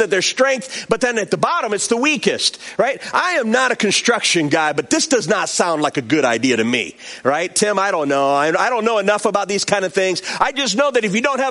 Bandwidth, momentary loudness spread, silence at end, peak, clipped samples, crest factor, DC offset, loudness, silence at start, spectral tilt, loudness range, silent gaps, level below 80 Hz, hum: 11.5 kHz; 4 LU; 0 s; 0 dBFS; under 0.1%; 16 dB; under 0.1%; -17 LUFS; 0 s; -2.5 dB/octave; 1 LU; none; -60 dBFS; none